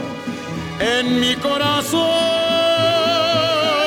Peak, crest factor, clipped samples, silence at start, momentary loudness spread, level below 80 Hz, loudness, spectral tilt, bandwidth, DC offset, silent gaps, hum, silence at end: -6 dBFS; 12 dB; under 0.1%; 0 s; 11 LU; -50 dBFS; -17 LUFS; -3.5 dB/octave; 18.5 kHz; under 0.1%; none; none; 0 s